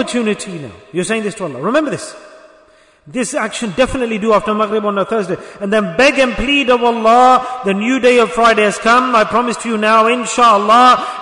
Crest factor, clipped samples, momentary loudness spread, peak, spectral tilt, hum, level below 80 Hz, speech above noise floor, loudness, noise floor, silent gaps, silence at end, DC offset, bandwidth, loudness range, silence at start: 14 dB; under 0.1%; 13 LU; 0 dBFS; -4 dB/octave; none; -40 dBFS; 35 dB; -13 LUFS; -48 dBFS; none; 0 s; under 0.1%; 11 kHz; 9 LU; 0 s